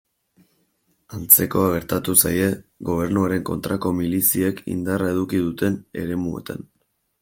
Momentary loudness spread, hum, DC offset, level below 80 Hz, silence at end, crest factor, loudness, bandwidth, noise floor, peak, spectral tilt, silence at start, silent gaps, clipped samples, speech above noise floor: 15 LU; none; under 0.1%; -52 dBFS; 0.6 s; 22 dB; -20 LUFS; 17 kHz; -67 dBFS; 0 dBFS; -4.5 dB/octave; 1.1 s; none; under 0.1%; 46 dB